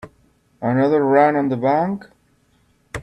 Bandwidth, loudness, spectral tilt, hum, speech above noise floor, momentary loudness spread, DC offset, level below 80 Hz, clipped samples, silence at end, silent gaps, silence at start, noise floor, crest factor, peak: 11.5 kHz; -18 LUFS; -8 dB/octave; none; 43 dB; 13 LU; under 0.1%; -56 dBFS; under 0.1%; 0 s; none; 0.05 s; -60 dBFS; 18 dB; -2 dBFS